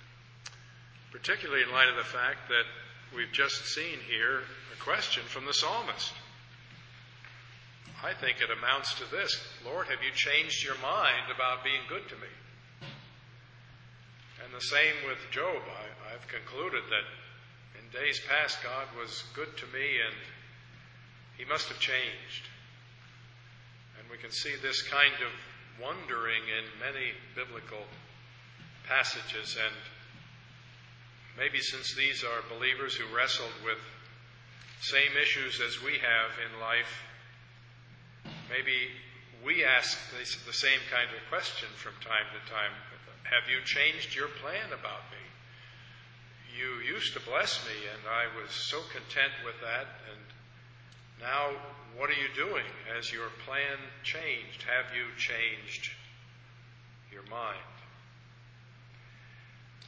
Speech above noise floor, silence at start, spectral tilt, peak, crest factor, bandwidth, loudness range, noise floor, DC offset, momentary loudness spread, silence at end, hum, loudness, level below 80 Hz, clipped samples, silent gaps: 22 dB; 0 s; -2 dB/octave; -6 dBFS; 28 dB; 8 kHz; 7 LU; -55 dBFS; under 0.1%; 24 LU; 0 s; none; -31 LUFS; -68 dBFS; under 0.1%; none